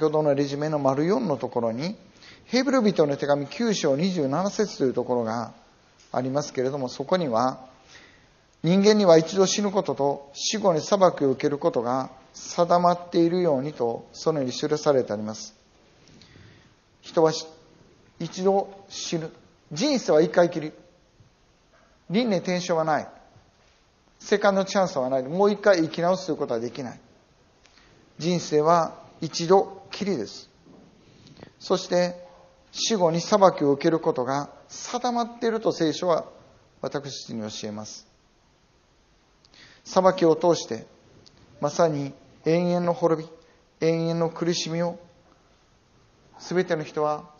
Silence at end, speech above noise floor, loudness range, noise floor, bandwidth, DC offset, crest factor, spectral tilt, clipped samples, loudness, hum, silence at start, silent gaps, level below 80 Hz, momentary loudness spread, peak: 0.15 s; 38 dB; 6 LU; -61 dBFS; 7.2 kHz; under 0.1%; 24 dB; -5 dB/octave; under 0.1%; -24 LUFS; none; 0 s; none; -66 dBFS; 15 LU; -2 dBFS